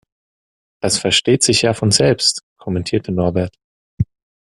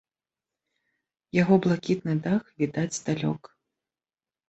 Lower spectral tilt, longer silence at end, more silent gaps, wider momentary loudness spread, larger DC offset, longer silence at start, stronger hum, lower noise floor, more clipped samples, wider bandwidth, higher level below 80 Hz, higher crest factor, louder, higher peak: second, -3.5 dB/octave vs -6.5 dB/octave; second, 0.45 s vs 1.1 s; first, 2.43-2.56 s, 3.64-3.97 s vs none; first, 12 LU vs 8 LU; neither; second, 0.85 s vs 1.35 s; neither; about the same, under -90 dBFS vs under -90 dBFS; neither; first, 12.5 kHz vs 8.4 kHz; first, -46 dBFS vs -64 dBFS; about the same, 18 dB vs 22 dB; first, -16 LUFS vs -26 LUFS; first, 0 dBFS vs -6 dBFS